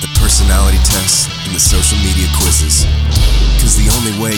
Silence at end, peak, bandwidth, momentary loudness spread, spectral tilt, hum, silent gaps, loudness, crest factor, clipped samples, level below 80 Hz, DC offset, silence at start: 0 s; 0 dBFS; over 20 kHz; 3 LU; -3 dB/octave; none; none; -11 LUFS; 10 dB; under 0.1%; -12 dBFS; under 0.1%; 0 s